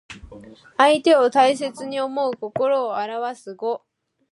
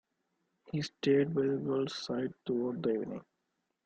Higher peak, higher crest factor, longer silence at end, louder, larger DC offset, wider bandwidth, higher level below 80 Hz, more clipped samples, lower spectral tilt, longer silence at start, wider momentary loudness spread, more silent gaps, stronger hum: first, -2 dBFS vs -16 dBFS; about the same, 20 dB vs 18 dB; about the same, 0.55 s vs 0.65 s; first, -20 LUFS vs -34 LUFS; neither; first, 11.5 kHz vs 8.8 kHz; first, -58 dBFS vs -72 dBFS; neither; second, -4 dB/octave vs -6.5 dB/octave; second, 0.1 s vs 0.7 s; first, 15 LU vs 10 LU; neither; neither